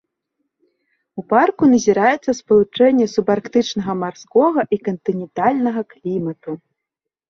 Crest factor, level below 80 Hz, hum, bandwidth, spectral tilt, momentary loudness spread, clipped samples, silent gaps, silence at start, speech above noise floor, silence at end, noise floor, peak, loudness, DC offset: 16 dB; -58 dBFS; none; 7.2 kHz; -5.5 dB/octave; 12 LU; under 0.1%; none; 1.15 s; 66 dB; 0.75 s; -83 dBFS; -2 dBFS; -17 LUFS; under 0.1%